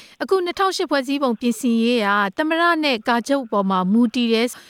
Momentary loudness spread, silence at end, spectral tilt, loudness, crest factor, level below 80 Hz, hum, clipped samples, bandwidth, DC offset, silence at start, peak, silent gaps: 4 LU; 0.1 s; -4.5 dB/octave; -19 LUFS; 14 dB; -66 dBFS; none; under 0.1%; 16 kHz; under 0.1%; 0 s; -6 dBFS; none